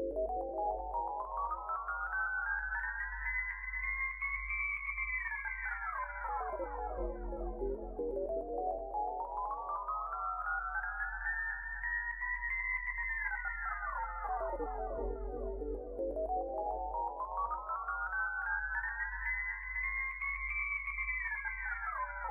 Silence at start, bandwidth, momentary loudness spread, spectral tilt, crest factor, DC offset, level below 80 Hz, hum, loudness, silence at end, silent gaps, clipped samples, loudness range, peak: 0 s; 3 kHz; 5 LU; -9 dB/octave; 14 dB; under 0.1%; -48 dBFS; none; -37 LUFS; 0 s; none; under 0.1%; 3 LU; -24 dBFS